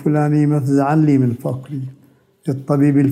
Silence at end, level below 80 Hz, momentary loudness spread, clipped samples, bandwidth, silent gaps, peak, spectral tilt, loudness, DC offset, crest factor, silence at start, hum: 0 s; -62 dBFS; 15 LU; under 0.1%; 13.5 kHz; none; -4 dBFS; -9.5 dB/octave; -16 LUFS; under 0.1%; 12 dB; 0 s; none